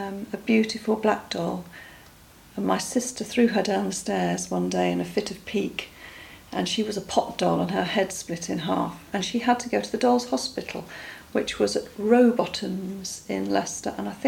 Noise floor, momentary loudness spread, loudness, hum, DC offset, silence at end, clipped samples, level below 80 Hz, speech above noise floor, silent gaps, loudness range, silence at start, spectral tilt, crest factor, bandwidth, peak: -51 dBFS; 12 LU; -26 LUFS; none; under 0.1%; 0 s; under 0.1%; -58 dBFS; 25 dB; none; 3 LU; 0 s; -4.5 dB/octave; 20 dB; 17 kHz; -6 dBFS